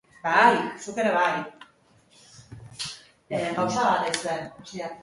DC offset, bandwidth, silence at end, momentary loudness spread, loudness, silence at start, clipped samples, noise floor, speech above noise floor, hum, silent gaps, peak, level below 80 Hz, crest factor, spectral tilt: under 0.1%; 11.5 kHz; 0 s; 20 LU; -25 LUFS; 0.25 s; under 0.1%; -59 dBFS; 35 dB; none; none; -4 dBFS; -64 dBFS; 22 dB; -3.5 dB/octave